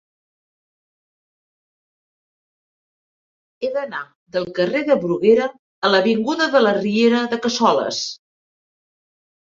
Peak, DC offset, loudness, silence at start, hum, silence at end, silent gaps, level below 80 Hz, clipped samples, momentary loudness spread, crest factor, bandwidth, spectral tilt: -2 dBFS; under 0.1%; -19 LUFS; 3.6 s; none; 1.4 s; 4.15-4.26 s, 5.59-5.82 s; -66 dBFS; under 0.1%; 12 LU; 18 dB; 7.6 kHz; -4.5 dB/octave